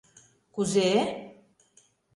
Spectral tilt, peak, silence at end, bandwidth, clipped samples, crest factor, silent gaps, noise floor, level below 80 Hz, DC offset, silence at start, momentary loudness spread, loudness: -4.5 dB/octave; -12 dBFS; 0.85 s; 11.5 kHz; under 0.1%; 18 dB; none; -64 dBFS; -70 dBFS; under 0.1%; 0.55 s; 18 LU; -26 LUFS